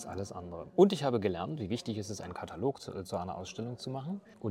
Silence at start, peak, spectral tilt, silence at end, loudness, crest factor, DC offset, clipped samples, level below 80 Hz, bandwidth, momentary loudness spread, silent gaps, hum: 0 s; -10 dBFS; -6.5 dB/octave; 0 s; -34 LUFS; 24 dB; under 0.1%; under 0.1%; -68 dBFS; 14 kHz; 15 LU; none; none